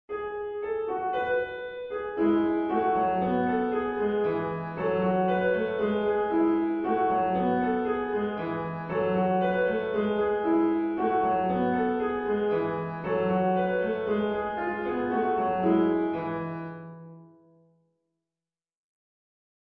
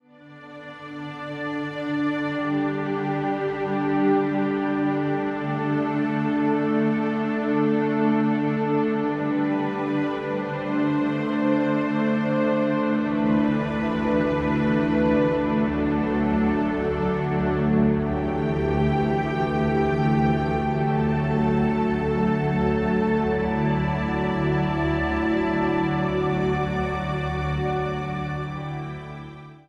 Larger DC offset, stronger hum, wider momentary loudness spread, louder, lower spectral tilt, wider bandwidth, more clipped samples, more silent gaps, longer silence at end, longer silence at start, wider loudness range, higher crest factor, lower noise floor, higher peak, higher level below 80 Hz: neither; neither; about the same, 8 LU vs 6 LU; second, -27 LUFS vs -23 LUFS; first, -10 dB/octave vs -8.5 dB/octave; second, 4.7 kHz vs 7.4 kHz; neither; neither; first, 2.4 s vs 0.1 s; second, 0.1 s vs 0.25 s; about the same, 3 LU vs 2 LU; about the same, 16 dB vs 14 dB; first, under -90 dBFS vs -46 dBFS; about the same, -12 dBFS vs -10 dBFS; second, -58 dBFS vs -40 dBFS